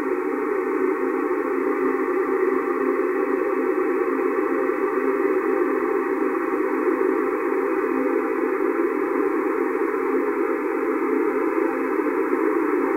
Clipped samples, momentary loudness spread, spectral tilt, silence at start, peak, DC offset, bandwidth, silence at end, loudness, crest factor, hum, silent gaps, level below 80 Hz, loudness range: under 0.1%; 2 LU; -6.5 dB/octave; 0 s; -10 dBFS; under 0.1%; 16 kHz; 0 s; -22 LUFS; 12 dB; none; none; -68 dBFS; 1 LU